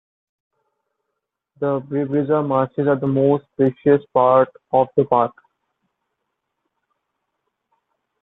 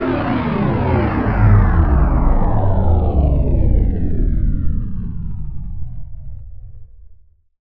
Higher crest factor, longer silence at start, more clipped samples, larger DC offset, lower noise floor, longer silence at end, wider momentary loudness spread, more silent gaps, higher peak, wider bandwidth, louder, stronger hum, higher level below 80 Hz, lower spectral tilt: first, 20 dB vs 14 dB; first, 1.6 s vs 0 s; neither; neither; first, -79 dBFS vs -46 dBFS; first, 2.9 s vs 0 s; second, 7 LU vs 18 LU; neither; about the same, -2 dBFS vs 0 dBFS; second, 4 kHz vs 4.8 kHz; about the same, -19 LUFS vs -17 LUFS; neither; second, -64 dBFS vs -18 dBFS; about the same, -11.5 dB/octave vs -11.5 dB/octave